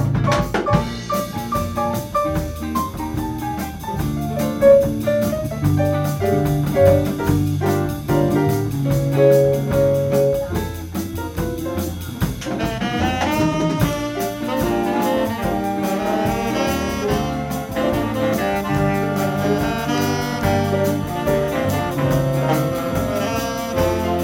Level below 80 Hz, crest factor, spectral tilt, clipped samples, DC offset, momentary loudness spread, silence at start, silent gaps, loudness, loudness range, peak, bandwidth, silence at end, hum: -36 dBFS; 18 dB; -6.5 dB/octave; under 0.1%; under 0.1%; 9 LU; 0 s; none; -20 LUFS; 5 LU; 0 dBFS; 16.5 kHz; 0 s; none